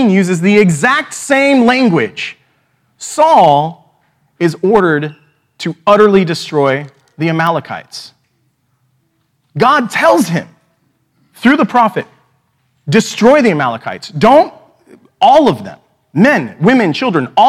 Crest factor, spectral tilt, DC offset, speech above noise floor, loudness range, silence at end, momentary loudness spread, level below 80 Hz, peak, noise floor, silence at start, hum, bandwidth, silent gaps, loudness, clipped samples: 12 dB; -5.5 dB/octave; under 0.1%; 51 dB; 4 LU; 0 s; 15 LU; -52 dBFS; 0 dBFS; -61 dBFS; 0 s; none; 15 kHz; none; -11 LUFS; 0.4%